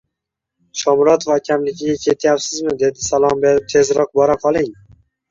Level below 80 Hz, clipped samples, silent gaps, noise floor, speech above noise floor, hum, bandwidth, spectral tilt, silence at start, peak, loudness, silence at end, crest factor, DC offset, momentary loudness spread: -50 dBFS; under 0.1%; none; -81 dBFS; 65 dB; none; 7.6 kHz; -4 dB/octave; 0.75 s; -2 dBFS; -16 LUFS; 0.6 s; 14 dB; under 0.1%; 7 LU